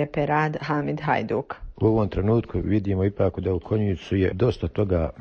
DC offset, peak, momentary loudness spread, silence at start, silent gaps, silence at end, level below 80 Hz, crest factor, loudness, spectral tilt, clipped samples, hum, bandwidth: under 0.1%; -8 dBFS; 4 LU; 0 s; none; 0 s; -40 dBFS; 16 dB; -24 LUFS; -9 dB/octave; under 0.1%; none; 6.8 kHz